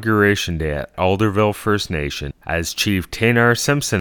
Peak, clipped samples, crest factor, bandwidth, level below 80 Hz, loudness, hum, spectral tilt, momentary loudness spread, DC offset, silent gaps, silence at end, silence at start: -2 dBFS; under 0.1%; 16 dB; 19 kHz; -36 dBFS; -18 LUFS; none; -4.5 dB/octave; 9 LU; under 0.1%; none; 0 s; 0 s